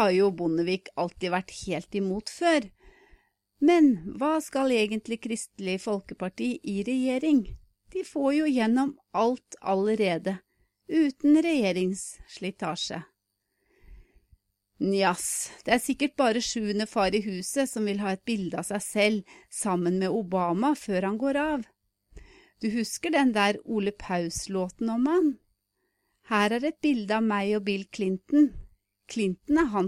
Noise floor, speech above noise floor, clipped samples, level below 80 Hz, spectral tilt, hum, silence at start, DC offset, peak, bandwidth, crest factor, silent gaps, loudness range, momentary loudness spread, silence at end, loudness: -79 dBFS; 53 dB; under 0.1%; -56 dBFS; -4.5 dB/octave; none; 0 s; under 0.1%; -8 dBFS; 15 kHz; 20 dB; none; 3 LU; 10 LU; 0 s; -27 LUFS